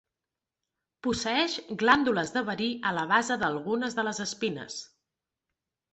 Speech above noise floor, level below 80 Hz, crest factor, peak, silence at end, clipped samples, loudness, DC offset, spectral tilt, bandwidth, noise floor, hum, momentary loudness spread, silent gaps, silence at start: 61 dB; -64 dBFS; 24 dB; -6 dBFS; 1.05 s; under 0.1%; -28 LUFS; under 0.1%; -3.5 dB/octave; 8.4 kHz; -89 dBFS; none; 9 LU; none; 1.05 s